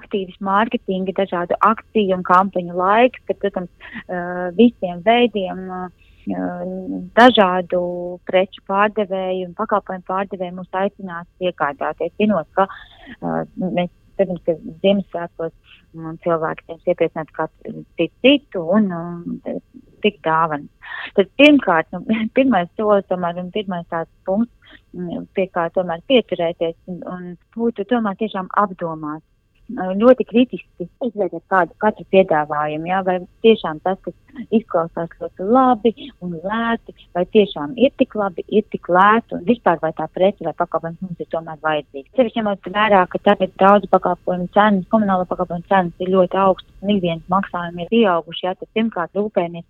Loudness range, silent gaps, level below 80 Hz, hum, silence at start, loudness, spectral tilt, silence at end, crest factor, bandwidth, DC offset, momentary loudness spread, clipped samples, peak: 6 LU; none; -52 dBFS; none; 0 s; -19 LUFS; -7.5 dB/octave; 0.1 s; 18 dB; 7.2 kHz; under 0.1%; 14 LU; under 0.1%; 0 dBFS